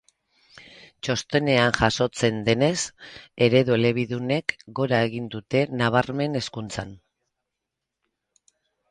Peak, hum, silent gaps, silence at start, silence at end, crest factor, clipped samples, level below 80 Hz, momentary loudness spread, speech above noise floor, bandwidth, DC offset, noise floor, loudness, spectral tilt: -4 dBFS; none; none; 0.55 s; 1.95 s; 22 dB; under 0.1%; -52 dBFS; 13 LU; 60 dB; 11 kHz; under 0.1%; -84 dBFS; -23 LUFS; -5 dB/octave